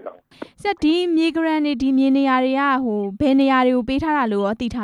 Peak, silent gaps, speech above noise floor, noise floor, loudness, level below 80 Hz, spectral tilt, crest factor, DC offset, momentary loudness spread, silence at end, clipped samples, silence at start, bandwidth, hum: -8 dBFS; none; 22 dB; -40 dBFS; -19 LUFS; -48 dBFS; -6 dB/octave; 12 dB; under 0.1%; 7 LU; 0 s; under 0.1%; 0.05 s; 10.5 kHz; none